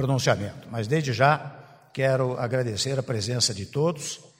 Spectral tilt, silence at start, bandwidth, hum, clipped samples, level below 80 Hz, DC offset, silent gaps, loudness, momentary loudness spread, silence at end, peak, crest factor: -4.5 dB/octave; 0 s; 16 kHz; none; under 0.1%; -60 dBFS; under 0.1%; none; -25 LUFS; 11 LU; 0.2 s; -4 dBFS; 22 dB